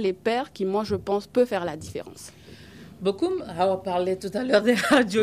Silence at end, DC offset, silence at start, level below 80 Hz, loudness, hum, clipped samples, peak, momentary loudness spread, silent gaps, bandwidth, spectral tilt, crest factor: 0 s; under 0.1%; 0 s; -58 dBFS; -24 LUFS; none; under 0.1%; -6 dBFS; 17 LU; none; 15.5 kHz; -5 dB/octave; 18 dB